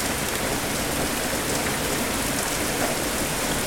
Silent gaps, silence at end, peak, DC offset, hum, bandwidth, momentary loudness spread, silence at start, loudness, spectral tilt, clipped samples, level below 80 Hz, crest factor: none; 0 s; -8 dBFS; under 0.1%; none; 19 kHz; 1 LU; 0 s; -24 LUFS; -2.5 dB/octave; under 0.1%; -40 dBFS; 18 dB